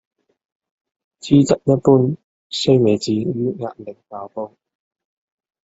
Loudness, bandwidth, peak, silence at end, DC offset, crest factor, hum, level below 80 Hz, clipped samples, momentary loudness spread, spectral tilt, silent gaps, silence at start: -17 LUFS; 8 kHz; -2 dBFS; 1.2 s; under 0.1%; 18 dB; none; -56 dBFS; under 0.1%; 20 LU; -7 dB/octave; 2.24-2.50 s; 1.25 s